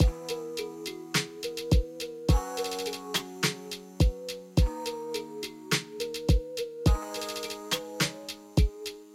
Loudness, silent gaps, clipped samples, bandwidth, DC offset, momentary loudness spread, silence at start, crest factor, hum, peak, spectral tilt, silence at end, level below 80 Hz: -31 LUFS; none; under 0.1%; 16.5 kHz; under 0.1%; 9 LU; 0 s; 20 dB; none; -10 dBFS; -4.5 dB/octave; 0 s; -34 dBFS